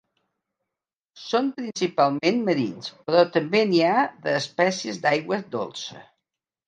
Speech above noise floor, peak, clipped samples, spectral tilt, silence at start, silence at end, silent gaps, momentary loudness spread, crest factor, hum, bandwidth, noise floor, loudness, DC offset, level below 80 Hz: 65 dB; -4 dBFS; under 0.1%; -5 dB/octave; 1.15 s; 0.65 s; none; 11 LU; 20 dB; none; 9.2 kHz; -88 dBFS; -23 LUFS; under 0.1%; -74 dBFS